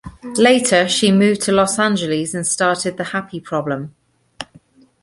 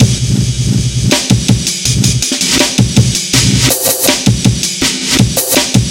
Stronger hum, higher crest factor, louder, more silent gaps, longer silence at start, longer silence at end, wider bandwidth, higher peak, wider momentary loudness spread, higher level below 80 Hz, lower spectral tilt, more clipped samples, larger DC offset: neither; first, 16 dB vs 10 dB; second, -16 LUFS vs -10 LUFS; neither; about the same, 0.05 s vs 0 s; first, 0.6 s vs 0 s; second, 11.5 kHz vs 17 kHz; about the same, -2 dBFS vs 0 dBFS; first, 19 LU vs 3 LU; second, -52 dBFS vs -26 dBFS; about the same, -4 dB/octave vs -3.5 dB/octave; second, under 0.1% vs 0.6%; neither